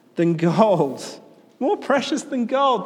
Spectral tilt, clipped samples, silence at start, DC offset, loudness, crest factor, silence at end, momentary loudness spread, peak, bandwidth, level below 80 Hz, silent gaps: -6 dB/octave; under 0.1%; 0.15 s; under 0.1%; -20 LUFS; 18 dB; 0 s; 9 LU; -2 dBFS; 12.5 kHz; -74 dBFS; none